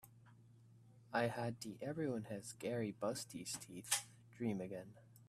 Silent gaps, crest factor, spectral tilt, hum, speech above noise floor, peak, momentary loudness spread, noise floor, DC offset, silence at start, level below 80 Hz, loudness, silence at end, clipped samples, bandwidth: none; 26 dB; -4 dB/octave; none; 22 dB; -20 dBFS; 10 LU; -65 dBFS; under 0.1%; 0.05 s; -80 dBFS; -43 LUFS; 0.05 s; under 0.1%; 15.5 kHz